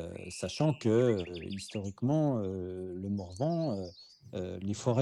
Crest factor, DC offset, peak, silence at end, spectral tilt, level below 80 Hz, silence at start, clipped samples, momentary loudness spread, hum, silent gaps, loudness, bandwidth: 18 dB; under 0.1%; -14 dBFS; 0 s; -7 dB/octave; -68 dBFS; 0 s; under 0.1%; 13 LU; none; none; -33 LUFS; 12 kHz